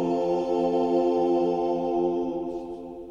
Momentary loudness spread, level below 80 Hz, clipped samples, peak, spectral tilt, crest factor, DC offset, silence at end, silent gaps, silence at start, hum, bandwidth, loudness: 11 LU; -56 dBFS; under 0.1%; -12 dBFS; -8 dB/octave; 12 dB; under 0.1%; 0 s; none; 0 s; none; 7.4 kHz; -25 LUFS